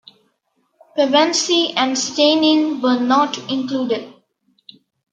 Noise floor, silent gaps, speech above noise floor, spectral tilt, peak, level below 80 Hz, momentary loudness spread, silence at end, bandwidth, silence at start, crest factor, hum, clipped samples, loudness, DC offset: -67 dBFS; none; 50 dB; -2 dB/octave; -2 dBFS; -72 dBFS; 9 LU; 1.05 s; 9.2 kHz; 0.95 s; 16 dB; none; under 0.1%; -17 LUFS; under 0.1%